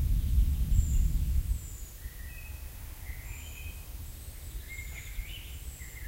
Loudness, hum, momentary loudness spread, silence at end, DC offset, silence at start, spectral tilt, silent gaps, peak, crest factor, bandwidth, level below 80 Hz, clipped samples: -36 LUFS; none; 15 LU; 0 s; under 0.1%; 0 s; -5 dB/octave; none; -14 dBFS; 18 dB; 16 kHz; -32 dBFS; under 0.1%